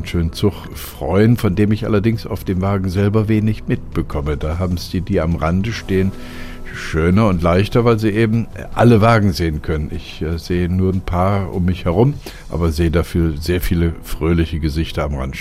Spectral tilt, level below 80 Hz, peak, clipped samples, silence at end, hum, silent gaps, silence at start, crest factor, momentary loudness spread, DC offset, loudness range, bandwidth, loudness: -7.5 dB/octave; -28 dBFS; -2 dBFS; under 0.1%; 0 s; none; none; 0 s; 14 dB; 9 LU; under 0.1%; 4 LU; 16 kHz; -17 LUFS